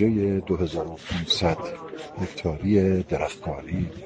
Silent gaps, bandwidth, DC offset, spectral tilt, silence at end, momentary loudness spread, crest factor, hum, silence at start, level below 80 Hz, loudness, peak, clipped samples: none; 9.2 kHz; under 0.1%; -6.5 dB/octave; 0 s; 12 LU; 16 dB; none; 0 s; -44 dBFS; -26 LUFS; -8 dBFS; under 0.1%